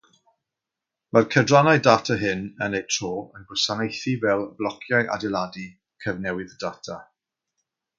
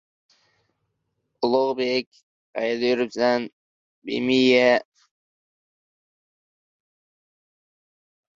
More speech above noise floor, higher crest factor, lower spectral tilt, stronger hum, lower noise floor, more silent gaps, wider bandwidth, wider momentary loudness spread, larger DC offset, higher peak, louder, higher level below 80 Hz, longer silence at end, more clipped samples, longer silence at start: first, 64 dB vs 55 dB; about the same, 24 dB vs 20 dB; about the same, -4.5 dB/octave vs -4.5 dB/octave; neither; first, -86 dBFS vs -76 dBFS; second, none vs 2.07-2.11 s, 2.23-2.53 s, 3.53-4.02 s; about the same, 7.6 kHz vs 7.6 kHz; about the same, 16 LU vs 17 LU; neither; first, 0 dBFS vs -6 dBFS; about the same, -23 LUFS vs -22 LUFS; first, -58 dBFS vs -68 dBFS; second, 0.95 s vs 3.55 s; neither; second, 1.15 s vs 1.4 s